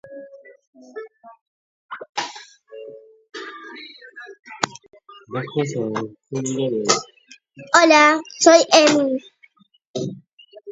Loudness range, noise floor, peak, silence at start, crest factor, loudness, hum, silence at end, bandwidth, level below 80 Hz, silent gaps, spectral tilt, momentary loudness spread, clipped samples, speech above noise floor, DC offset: 19 LU; -56 dBFS; 0 dBFS; 0.1 s; 22 dB; -18 LUFS; none; 0 s; 8 kHz; -70 dBFS; 0.67-0.73 s, 1.41-1.89 s, 2.09-2.13 s, 4.39-4.43 s, 9.87-9.94 s, 10.33-10.38 s; -3 dB/octave; 26 LU; under 0.1%; 38 dB; under 0.1%